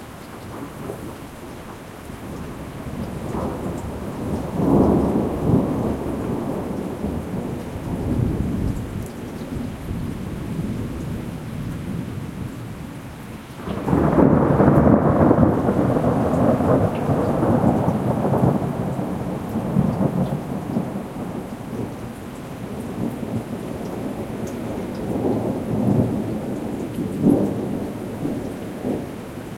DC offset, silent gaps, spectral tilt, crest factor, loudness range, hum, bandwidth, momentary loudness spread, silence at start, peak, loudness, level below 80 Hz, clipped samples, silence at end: under 0.1%; none; -8.5 dB/octave; 22 dB; 12 LU; none; 16.5 kHz; 17 LU; 0 s; 0 dBFS; -22 LUFS; -38 dBFS; under 0.1%; 0 s